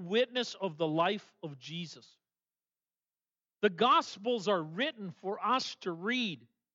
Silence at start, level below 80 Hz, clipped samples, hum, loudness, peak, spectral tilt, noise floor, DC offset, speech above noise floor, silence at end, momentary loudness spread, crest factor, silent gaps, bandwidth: 0 s; under -90 dBFS; under 0.1%; 60 Hz at -65 dBFS; -32 LUFS; -14 dBFS; -4.5 dB/octave; under -90 dBFS; under 0.1%; over 57 dB; 0.35 s; 14 LU; 20 dB; none; 7.8 kHz